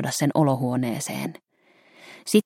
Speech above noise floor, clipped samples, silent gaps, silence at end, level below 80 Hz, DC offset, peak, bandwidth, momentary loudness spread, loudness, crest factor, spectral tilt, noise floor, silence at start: 36 dB; under 0.1%; none; 0.05 s; -68 dBFS; under 0.1%; -6 dBFS; 16.5 kHz; 15 LU; -24 LUFS; 18 dB; -5.5 dB/octave; -59 dBFS; 0 s